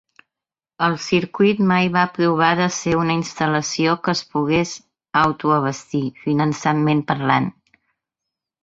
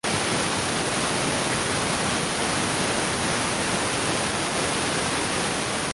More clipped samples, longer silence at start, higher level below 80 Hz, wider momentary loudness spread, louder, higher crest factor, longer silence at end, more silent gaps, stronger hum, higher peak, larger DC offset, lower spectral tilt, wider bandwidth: neither; first, 0.8 s vs 0.05 s; second, -56 dBFS vs -46 dBFS; first, 6 LU vs 1 LU; first, -19 LUFS vs -24 LUFS; first, 20 dB vs 14 dB; first, 1.1 s vs 0 s; neither; neither; first, 0 dBFS vs -12 dBFS; neither; first, -5.5 dB/octave vs -2.5 dB/octave; second, 8 kHz vs 12 kHz